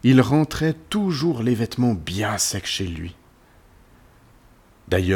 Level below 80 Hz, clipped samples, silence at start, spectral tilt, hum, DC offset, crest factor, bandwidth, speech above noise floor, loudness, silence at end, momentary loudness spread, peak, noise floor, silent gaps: -46 dBFS; under 0.1%; 0.05 s; -5 dB/octave; none; under 0.1%; 18 dB; 19 kHz; 32 dB; -22 LUFS; 0 s; 8 LU; -4 dBFS; -53 dBFS; none